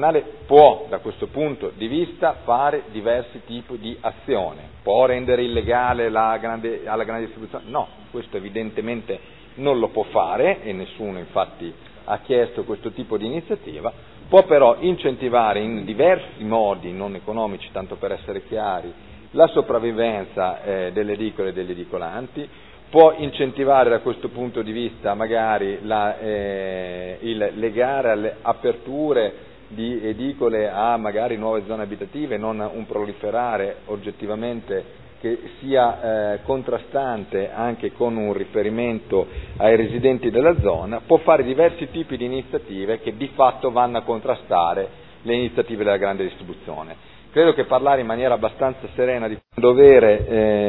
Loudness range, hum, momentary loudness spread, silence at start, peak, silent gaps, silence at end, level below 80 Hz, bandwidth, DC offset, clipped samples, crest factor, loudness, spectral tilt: 7 LU; none; 14 LU; 0 s; 0 dBFS; none; 0 s; -46 dBFS; 4.1 kHz; 0.4%; under 0.1%; 20 dB; -21 LUFS; -10 dB/octave